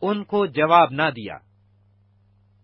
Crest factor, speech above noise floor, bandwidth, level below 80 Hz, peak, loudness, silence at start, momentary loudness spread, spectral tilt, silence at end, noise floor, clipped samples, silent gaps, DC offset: 20 dB; 39 dB; 5.8 kHz; -64 dBFS; -2 dBFS; -19 LUFS; 0 s; 20 LU; -10 dB/octave; 1.25 s; -59 dBFS; under 0.1%; none; under 0.1%